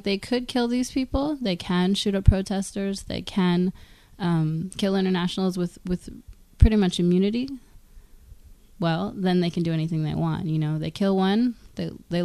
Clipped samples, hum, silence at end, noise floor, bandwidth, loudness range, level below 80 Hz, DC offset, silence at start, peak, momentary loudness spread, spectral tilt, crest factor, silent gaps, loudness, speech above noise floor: under 0.1%; none; 0 s; -48 dBFS; 13 kHz; 3 LU; -34 dBFS; under 0.1%; 0.05 s; 0 dBFS; 9 LU; -6.5 dB/octave; 24 dB; none; -25 LUFS; 25 dB